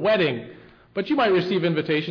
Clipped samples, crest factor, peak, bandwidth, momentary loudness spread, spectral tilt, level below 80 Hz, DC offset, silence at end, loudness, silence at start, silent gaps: under 0.1%; 10 dB; -12 dBFS; 5.4 kHz; 13 LU; -7.5 dB/octave; -62 dBFS; under 0.1%; 0 s; -22 LUFS; 0 s; none